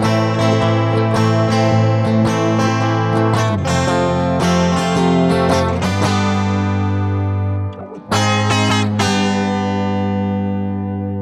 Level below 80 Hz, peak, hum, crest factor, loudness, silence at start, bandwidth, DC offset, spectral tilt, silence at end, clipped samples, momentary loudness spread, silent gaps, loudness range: -42 dBFS; -2 dBFS; none; 14 dB; -16 LUFS; 0 s; 12 kHz; under 0.1%; -6 dB/octave; 0 s; under 0.1%; 5 LU; none; 2 LU